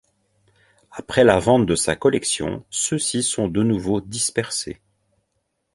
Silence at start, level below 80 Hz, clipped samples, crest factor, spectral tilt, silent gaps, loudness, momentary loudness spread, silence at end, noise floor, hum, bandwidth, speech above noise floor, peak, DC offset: 0.9 s; -48 dBFS; under 0.1%; 20 dB; -4 dB/octave; none; -20 LUFS; 11 LU; 1 s; -73 dBFS; none; 12 kHz; 53 dB; -2 dBFS; under 0.1%